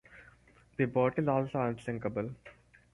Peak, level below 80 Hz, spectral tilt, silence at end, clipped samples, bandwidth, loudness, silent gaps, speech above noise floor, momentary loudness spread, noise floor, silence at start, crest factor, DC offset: -14 dBFS; -64 dBFS; -9 dB/octave; 0.4 s; under 0.1%; 11.5 kHz; -33 LUFS; none; 30 dB; 14 LU; -62 dBFS; 0.1 s; 20 dB; under 0.1%